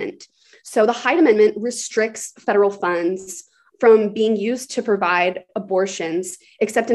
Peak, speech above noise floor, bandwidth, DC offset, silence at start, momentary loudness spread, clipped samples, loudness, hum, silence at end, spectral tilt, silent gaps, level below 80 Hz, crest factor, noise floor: -2 dBFS; 30 dB; 12.5 kHz; under 0.1%; 0 s; 12 LU; under 0.1%; -19 LUFS; none; 0 s; -4 dB/octave; none; -70 dBFS; 18 dB; -48 dBFS